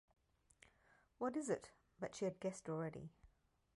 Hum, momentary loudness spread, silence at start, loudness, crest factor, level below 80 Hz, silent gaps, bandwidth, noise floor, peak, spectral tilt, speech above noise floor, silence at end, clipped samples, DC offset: none; 12 LU; 1.2 s; -46 LUFS; 20 dB; -78 dBFS; none; 11 kHz; -75 dBFS; -28 dBFS; -6 dB/octave; 30 dB; 0.5 s; under 0.1%; under 0.1%